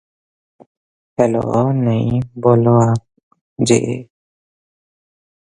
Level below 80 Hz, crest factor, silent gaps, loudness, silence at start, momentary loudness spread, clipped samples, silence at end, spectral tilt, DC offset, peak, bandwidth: -48 dBFS; 18 dB; 3.23-3.31 s, 3.41-3.56 s; -16 LUFS; 1.2 s; 11 LU; under 0.1%; 1.45 s; -7 dB/octave; under 0.1%; 0 dBFS; 11.5 kHz